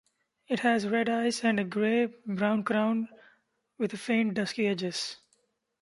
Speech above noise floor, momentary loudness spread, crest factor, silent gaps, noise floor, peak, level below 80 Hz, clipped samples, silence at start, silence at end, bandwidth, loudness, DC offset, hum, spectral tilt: 45 dB; 8 LU; 18 dB; none; -73 dBFS; -10 dBFS; -74 dBFS; under 0.1%; 0.5 s; 0.65 s; 11.5 kHz; -29 LUFS; under 0.1%; none; -5 dB/octave